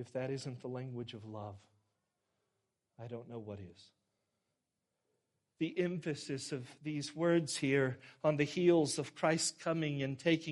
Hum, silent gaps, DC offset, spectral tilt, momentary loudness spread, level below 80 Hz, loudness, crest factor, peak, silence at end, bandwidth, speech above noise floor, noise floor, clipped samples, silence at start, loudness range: none; none; under 0.1%; -5 dB/octave; 16 LU; -78 dBFS; -36 LUFS; 20 dB; -18 dBFS; 0 s; 11.5 kHz; 51 dB; -87 dBFS; under 0.1%; 0 s; 20 LU